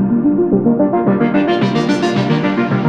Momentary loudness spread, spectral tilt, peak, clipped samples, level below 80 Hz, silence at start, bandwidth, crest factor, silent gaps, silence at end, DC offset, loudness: 2 LU; -7.5 dB/octave; -2 dBFS; under 0.1%; -48 dBFS; 0 s; 8.8 kHz; 12 dB; none; 0 s; under 0.1%; -14 LUFS